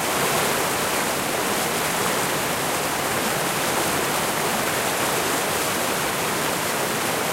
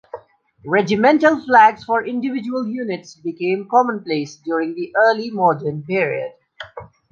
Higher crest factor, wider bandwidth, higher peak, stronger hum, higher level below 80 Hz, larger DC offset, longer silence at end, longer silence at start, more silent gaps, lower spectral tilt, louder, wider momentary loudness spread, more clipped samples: about the same, 14 dB vs 18 dB; first, 16 kHz vs 7.4 kHz; second, -8 dBFS vs -2 dBFS; neither; first, -52 dBFS vs -62 dBFS; neither; second, 0 s vs 0.3 s; second, 0 s vs 0.15 s; neither; second, -2 dB/octave vs -6 dB/octave; second, -22 LUFS vs -18 LUFS; second, 2 LU vs 20 LU; neither